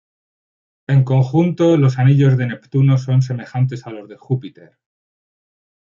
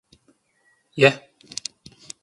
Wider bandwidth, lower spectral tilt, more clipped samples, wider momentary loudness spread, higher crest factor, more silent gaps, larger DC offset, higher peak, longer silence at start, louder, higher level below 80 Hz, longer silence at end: second, 7.2 kHz vs 11.5 kHz; first, -9 dB/octave vs -4 dB/octave; neither; second, 12 LU vs 20 LU; second, 14 dB vs 26 dB; neither; neither; second, -4 dBFS vs 0 dBFS; about the same, 0.9 s vs 0.95 s; first, -16 LUFS vs -21 LUFS; first, -58 dBFS vs -68 dBFS; first, 1.4 s vs 1.05 s